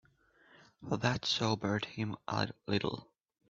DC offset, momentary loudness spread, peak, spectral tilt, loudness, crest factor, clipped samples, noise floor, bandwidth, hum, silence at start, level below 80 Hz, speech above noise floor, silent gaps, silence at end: under 0.1%; 8 LU; -16 dBFS; -4 dB/octave; -35 LUFS; 20 dB; under 0.1%; -67 dBFS; 7.8 kHz; none; 0.8 s; -66 dBFS; 32 dB; none; 0.45 s